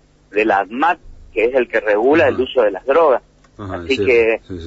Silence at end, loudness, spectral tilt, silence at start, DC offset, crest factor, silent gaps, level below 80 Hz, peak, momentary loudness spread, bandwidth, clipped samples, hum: 0 s; -16 LUFS; -6 dB/octave; 0.35 s; under 0.1%; 12 dB; none; -46 dBFS; -4 dBFS; 12 LU; 8 kHz; under 0.1%; none